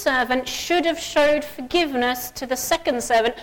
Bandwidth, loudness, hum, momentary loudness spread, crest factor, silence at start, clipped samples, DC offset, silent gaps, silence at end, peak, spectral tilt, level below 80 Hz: 17.5 kHz; -21 LUFS; none; 5 LU; 12 dB; 0 s; under 0.1%; under 0.1%; none; 0 s; -10 dBFS; -2 dB/octave; -46 dBFS